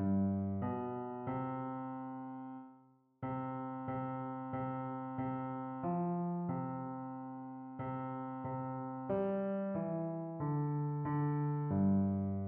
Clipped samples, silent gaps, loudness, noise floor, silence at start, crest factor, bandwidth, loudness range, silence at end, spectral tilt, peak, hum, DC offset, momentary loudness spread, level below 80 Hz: under 0.1%; none; -39 LUFS; -65 dBFS; 0 s; 16 dB; 3.4 kHz; 6 LU; 0 s; -10.5 dB/octave; -24 dBFS; none; under 0.1%; 11 LU; -72 dBFS